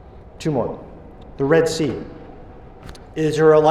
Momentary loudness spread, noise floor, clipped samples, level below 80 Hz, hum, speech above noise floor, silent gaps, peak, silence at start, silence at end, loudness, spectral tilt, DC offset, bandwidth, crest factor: 25 LU; -40 dBFS; under 0.1%; -44 dBFS; none; 23 dB; none; -4 dBFS; 0.15 s; 0 s; -19 LUFS; -6 dB/octave; under 0.1%; 12.5 kHz; 16 dB